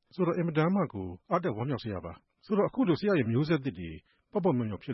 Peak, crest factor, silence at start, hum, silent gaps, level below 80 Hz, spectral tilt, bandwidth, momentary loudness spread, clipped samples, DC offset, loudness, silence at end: -14 dBFS; 16 dB; 0.15 s; none; none; -64 dBFS; -10 dB/octave; 6 kHz; 13 LU; under 0.1%; under 0.1%; -30 LUFS; 0 s